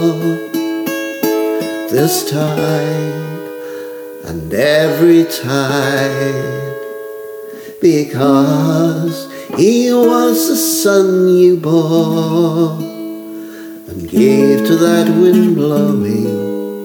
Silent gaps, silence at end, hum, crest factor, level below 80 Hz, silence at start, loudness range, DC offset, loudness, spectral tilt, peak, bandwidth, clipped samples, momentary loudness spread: none; 0 s; none; 12 dB; -52 dBFS; 0 s; 5 LU; under 0.1%; -13 LUFS; -5.5 dB/octave; 0 dBFS; over 20 kHz; under 0.1%; 16 LU